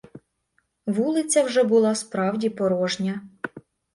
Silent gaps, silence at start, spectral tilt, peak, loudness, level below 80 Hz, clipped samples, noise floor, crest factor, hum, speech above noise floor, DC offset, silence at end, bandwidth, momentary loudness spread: none; 0.15 s; -4.5 dB/octave; -8 dBFS; -23 LUFS; -68 dBFS; under 0.1%; -71 dBFS; 16 dB; none; 49 dB; under 0.1%; 0.35 s; 11.5 kHz; 16 LU